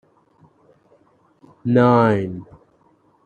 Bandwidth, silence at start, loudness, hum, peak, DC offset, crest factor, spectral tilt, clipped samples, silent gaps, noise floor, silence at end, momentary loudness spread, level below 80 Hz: 7 kHz; 1.65 s; -17 LUFS; none; -2 dBFS; under 0.1%; 20 dB; -9 dB/octave; under 0.1%; none; -58 dBFS; 0.8 s; 16 LU; -60 dBFS